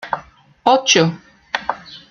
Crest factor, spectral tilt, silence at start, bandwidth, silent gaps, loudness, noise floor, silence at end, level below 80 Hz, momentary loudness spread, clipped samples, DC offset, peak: 18 dB; -3 dB/octave; 0.05 s; 7.4 kHz; none; -17 LUFS; -41 dBFS; 0.1 s; -58 dBFS; 17 LU; under 0.1%; under 0.1%; 0 dBFS